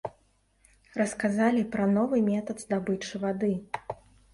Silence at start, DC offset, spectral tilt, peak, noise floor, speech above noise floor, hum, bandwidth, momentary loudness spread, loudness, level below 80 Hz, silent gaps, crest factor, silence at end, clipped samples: 0.05 s; under 0.1%; -6.5 dB/octave; -12 dBFS; -67 dBFS; 40 dB; none; 11.5 kHz; 14 LU; -28 LUFS; -62 dBFS; none; 16 dB; 0.4 s; under 0.1%